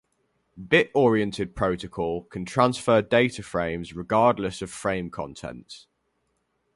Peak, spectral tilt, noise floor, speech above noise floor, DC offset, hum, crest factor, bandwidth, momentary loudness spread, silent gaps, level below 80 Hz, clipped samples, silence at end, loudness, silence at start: -4 dBFS; -5.5 dB/octave; -73 dBFS; 49 dB; under 0.1%; none; 20 dB; 11.5 kHz; 15 LU; none; -52 dBFS; under 0.1%; 0.95 s; -24 LUFS; 0.55 s